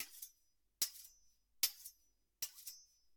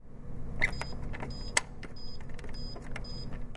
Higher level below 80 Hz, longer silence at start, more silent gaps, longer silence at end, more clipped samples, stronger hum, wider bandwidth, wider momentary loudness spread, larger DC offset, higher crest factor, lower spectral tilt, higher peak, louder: second, -82 dBFS vs -40 dBFS; about the same, 0 s vs 0 s; neither; first, 0.35 s vs 0 s; neither; neither; first, 18 kHz vs 11.5 kHz; first, 18 LU vs 14 LU; neither; about the same, 32 dB vs 30 dB; second, 3 dB/octave vs -3 dB/octave; second, -16 dBFS vs -4 dBFS; second, -42 LUFS vs -37 LUFS